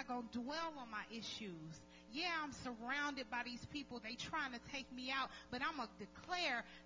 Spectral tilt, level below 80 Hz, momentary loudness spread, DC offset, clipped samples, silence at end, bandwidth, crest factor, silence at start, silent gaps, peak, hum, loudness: -3 dB/octave; -70 dBFS; 9 LU; under 0.1%; under 0.1%; 0 s; 7.6 kHz; 18 dB; 0 s; none; -28 dBFS; none; -45 LUFS